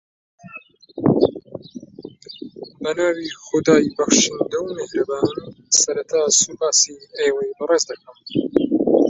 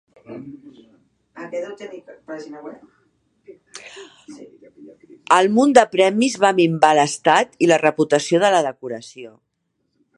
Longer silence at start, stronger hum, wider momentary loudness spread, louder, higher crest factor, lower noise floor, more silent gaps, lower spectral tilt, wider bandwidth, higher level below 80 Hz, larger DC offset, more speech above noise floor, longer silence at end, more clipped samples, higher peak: first, 0.45 s vs 0.3 s; neither; about the same, 22 LU vs 24 LU; second, -19 LUFS vs -16 LUFS; about the same, 20 dB vs 20 dB; second, -42 dBFS vs -71 dBFS; neither; second, -3 dB/octave vs -4.5 dB/octave; second, 8.4 kHz vs 11.5 kHz; first, -56 dBFS vs -68 dBFS; neither; second, 23 dB vs 52 dB; second, 0 s vs 0.9 s; neither; about the same, 0 dBFS vs 0 dBFS